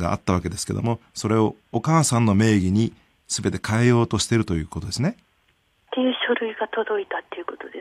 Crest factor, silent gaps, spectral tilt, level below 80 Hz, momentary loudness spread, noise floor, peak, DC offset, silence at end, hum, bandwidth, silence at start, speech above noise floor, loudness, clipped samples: 16 dB; none; -5.5 dB/octave; -46 dBFS; 10 LU; -65 dBFS; -6 dBFS; under 0.1%; 0 s; none; 13.5 kHz; 0 s; 43 dB; -22 LUFS; under 0.1%